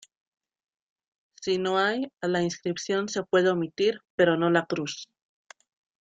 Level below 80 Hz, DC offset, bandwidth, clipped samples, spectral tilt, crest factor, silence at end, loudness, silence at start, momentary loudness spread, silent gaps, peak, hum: -70 dBFS; under 0.1%; 8.8 kHz; under 0.1%; -5 dB/octave; 20 dB; 0.95 s; -26 LUFS; 1.4 s; 8 LU; 4.10-4.18 s; -8 dBFS; none